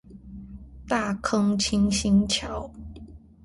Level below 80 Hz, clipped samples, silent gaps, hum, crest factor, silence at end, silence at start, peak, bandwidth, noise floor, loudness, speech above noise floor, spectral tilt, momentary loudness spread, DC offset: -42 dBFS; under 0.1%; none; none; 18 dB; 0.25 s; 0.1 s; -8 dBFS; 11.5 kHz; -45 dBFS; -24 LUFS; 22 dB; -4.5 dB/octave; 23 LU; under 0.1%